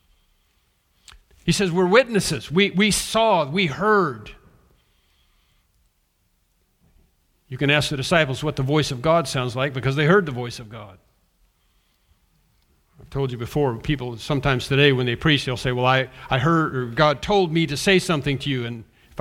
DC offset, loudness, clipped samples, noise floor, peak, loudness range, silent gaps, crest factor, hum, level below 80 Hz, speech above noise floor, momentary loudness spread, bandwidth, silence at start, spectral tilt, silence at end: under 0.1%; -21 LUFS; under 0.1%; -67 dBFS; -2 dBFS; 9 LU; none; 22 dB; none; -46 dBFS; 46 dB; 11 LU; 16 kHz; 1.45 s; -5 dB/octave; 0 s